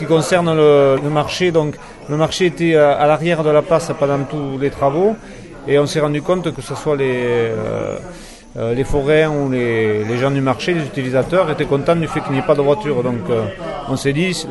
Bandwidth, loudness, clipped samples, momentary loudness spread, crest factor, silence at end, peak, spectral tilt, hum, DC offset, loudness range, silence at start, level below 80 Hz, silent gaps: 11.5 kHz; -16 LUFS; under 0.1%; 11 LU; 14 dB; 0 s; -2 dBFS; -6 dB/octave; none; 0.1%; 4 LU; 0 s; -38 dBFS; none